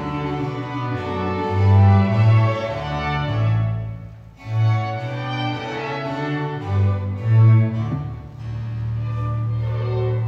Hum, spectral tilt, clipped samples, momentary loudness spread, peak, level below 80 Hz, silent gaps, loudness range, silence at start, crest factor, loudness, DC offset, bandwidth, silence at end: none; -8.5 dB/octave; under 0.1%; 13 LU; -4 dBFS; -42 dBFS; none; 5 LU; 0 s; 14 dB; -21 LUFS; under 0.1%; 6.2 kHz; 0 s